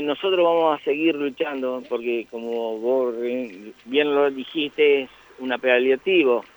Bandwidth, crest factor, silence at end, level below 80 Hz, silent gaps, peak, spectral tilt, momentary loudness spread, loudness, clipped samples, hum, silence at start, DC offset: over 20 kHz; 16 dB; 0.1 s; -70 dBFS; none; -6 dBFS; -5.5 dB/octave; 10 LU; -22 LUFS; under 0.1%; none; 0 s; under 0.1%